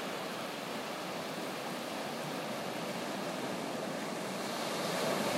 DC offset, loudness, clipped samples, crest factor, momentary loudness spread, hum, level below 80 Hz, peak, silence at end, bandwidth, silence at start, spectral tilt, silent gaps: under 0.1%; -38 LUFS; under 0.1%; 16 dB; 5 LU; none; -82 dBFS; -20 dBFS; 0 s; 16 kHz; 0 s; -3.5 dB/octave; none